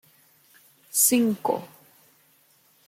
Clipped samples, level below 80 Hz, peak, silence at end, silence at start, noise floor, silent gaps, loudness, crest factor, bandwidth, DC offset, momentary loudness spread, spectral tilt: under 0.1%; -76 dBFS; -6 dBFS; 1.2 s; 0.95 s; -61 dBFS; none; -22 LUFS; 22 dB; 16.5 kHz; under 0.1%; 10 LU; -3 dB/octave